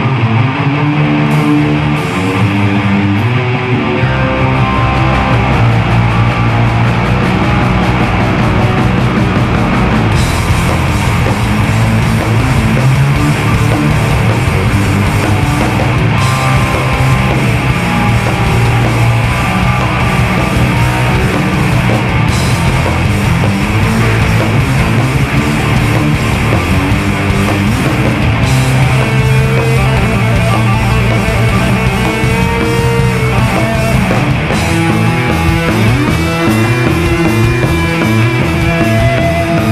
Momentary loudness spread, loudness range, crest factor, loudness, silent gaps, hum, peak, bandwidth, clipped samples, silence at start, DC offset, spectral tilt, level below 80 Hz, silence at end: 2 LU; 1 LU; 10 dB; -11 LUFS; none; none; 0 dBFS; 14.5 kHz; under 0.1%; 0 s; under 0.1%; -6 dB/octave; -22 dBFS; 0 s